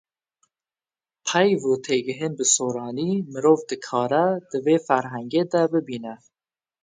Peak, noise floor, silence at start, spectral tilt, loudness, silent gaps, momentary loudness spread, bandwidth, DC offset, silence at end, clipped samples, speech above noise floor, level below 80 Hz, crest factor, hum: -4 dBFS; under -90 dBFS; 1.25 s; -4 dB/octave; -22 LUFS; none; 8 LU; 9.6 kHz; under 0.1%; 0.65 s; under 0.1%; over 68 dB; -72 dBFS; 20 dB; none